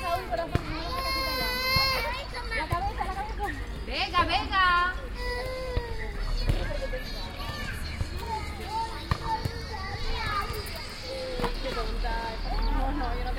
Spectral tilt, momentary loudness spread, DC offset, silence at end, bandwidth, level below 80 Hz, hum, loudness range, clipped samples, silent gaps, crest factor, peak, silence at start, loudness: -4.5 dB/octave; 11 LU; under 0.1%; 0 s; 16.5 kHz; -34 dBFS; none; 6 LU; under 0.1%; none; 22 dB; -8 dBFS; 0 s; -30 LUFS